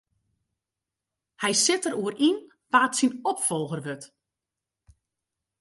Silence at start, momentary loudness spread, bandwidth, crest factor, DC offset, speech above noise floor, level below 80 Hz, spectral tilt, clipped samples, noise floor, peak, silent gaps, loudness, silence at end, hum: 1.4 s; 12 LU; 12 kHz; 22 dB; under 0.1%; 63 dB; -72 dBFS; -2.5 dB/octave; under 0.1%; -88 dBFS; -6 dBFS; none; -25 LUFS; 1.55 s; none